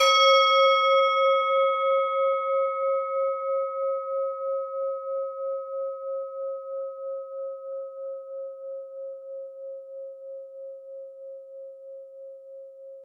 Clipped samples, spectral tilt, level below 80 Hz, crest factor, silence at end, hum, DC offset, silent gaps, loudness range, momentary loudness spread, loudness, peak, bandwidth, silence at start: under 0.1%; 3.5 dB/octave; under -90 dBFS; 18 dB; 0 s; none; under 0.1%; none; 18 LU; 23 LU; -25 LUFS; -8 dBFS; 12 kHz; 0 s